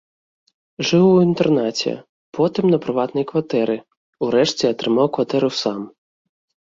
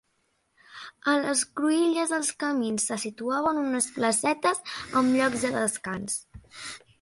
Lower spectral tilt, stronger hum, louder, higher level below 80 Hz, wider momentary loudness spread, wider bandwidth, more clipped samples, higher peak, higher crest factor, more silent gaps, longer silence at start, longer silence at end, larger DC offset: first, -6 dB/octave vs -3 dB/octave; neither; first, -19 LUFS vs -26 LUFS; about the same, -60 dBFS vs -62 dBFS; about the same, 12 LU vs 10 LU; second, 7.6 kHz vs 12 kHz; neither; first, -4 dBFS vs -10 dBFS; about the same, 16 dB vs 18 dB; first, 2.09-2.32 s, 3.97-4.13 s vs none; about the same, 0.8 s vs 0.7 s; first, 0.75 s vs 0.25 s; neither